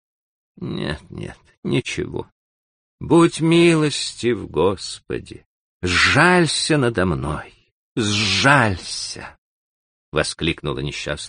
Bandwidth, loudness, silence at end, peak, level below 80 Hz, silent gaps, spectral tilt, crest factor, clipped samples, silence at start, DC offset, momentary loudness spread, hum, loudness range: 10 kHz; -19 LUFS; 0 s; 0 dBFS; -44 dBFS; 1.57-1.63 s, 2.32-2.98 s, 5.46-5.80 s, 7.72-7.96 s, 9.38-10.12 s; -4.5 dB/octave; 20 dB; under 0.1%; 0.6 s; under 0.1%; 17 LU; none; 4 LU